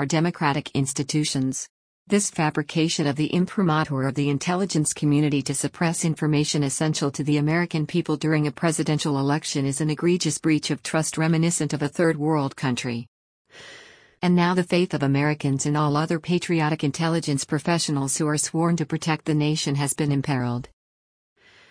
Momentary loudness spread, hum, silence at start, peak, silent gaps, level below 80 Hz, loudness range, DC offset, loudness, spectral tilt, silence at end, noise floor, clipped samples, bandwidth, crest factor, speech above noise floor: 4 LU; none; 0 s; -8 dBFS; 1.69-2.06 s, 13.08-13.45 s; -60 dBFS; 2 LU; under 0.1%; -23 LUFS; -5 dB/octave; 1.05 s; under -90 dBFS; under 0.1%; 10.5 kHz; 16 dB; over 67 dB